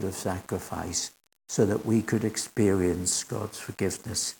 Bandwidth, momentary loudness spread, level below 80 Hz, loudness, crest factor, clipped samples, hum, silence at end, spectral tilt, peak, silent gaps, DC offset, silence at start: 18 kHz; 10 LU; -60 dBFS; -28 LUFS; 18 dB; under 0.1%; none; 0.05 s; -4.5 dB/octave; -10 dBFS; none; under 0.1%; 0 s